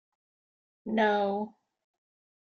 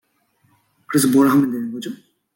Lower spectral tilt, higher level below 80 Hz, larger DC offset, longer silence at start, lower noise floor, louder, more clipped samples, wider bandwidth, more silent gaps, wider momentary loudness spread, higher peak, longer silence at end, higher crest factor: second, -3.5 dB/octave vs -5 dB/octave; second, -76 dBFS vs -66 dBFS; neither; about the same, 0.85 s vs 0.9 s; first, under -90 dBFS vs -63 dBFS; second, -29 LUFS vs -17 LUFS; neither; second, 6.6 kHz vs 17 kHz; neither; about the same, 16 LU vs 18 LU; second, -14 dBFS vs -4 dBFS; first, 1 s vs 0.4 s; about the same, 20 dB vs 16 dB